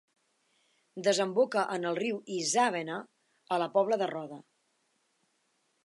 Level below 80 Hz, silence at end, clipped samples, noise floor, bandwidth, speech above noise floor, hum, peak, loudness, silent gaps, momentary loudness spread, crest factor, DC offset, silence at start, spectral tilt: -88 dBFS; 1.45 s; under 0.1%; -75 dBFS; 11.5 kHz; 45 dB; none; -14 dBFS; -30 LUFS; none; 14 LU; 20 dB; under 0.1%; 0.95 s; -3.5 dB/octave